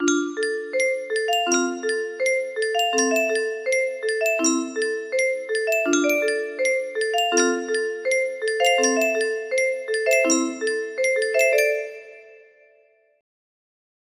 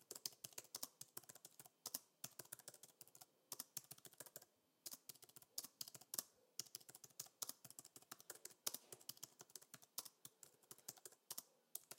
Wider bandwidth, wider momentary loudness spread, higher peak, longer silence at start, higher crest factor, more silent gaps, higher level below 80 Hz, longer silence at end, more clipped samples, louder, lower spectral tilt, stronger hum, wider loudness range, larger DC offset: about the same, 15.5 kHz vs 17 kHz; second, 6 LU vs 13 LU; first, -6 dBFS vs -22 dBFS; about the same, 0 s vs 0 s; second, 18 dB vs 34 dB; neither; first, -74 dBFS vs under -90 dBFS; first, 1.8 s vs 0 s; neither; first, -22 LUFS vs -54 LUFS; about the same, 0 dB/octave vs 0 dB/octave; neither; second, 1 LU vs 4 LU; neither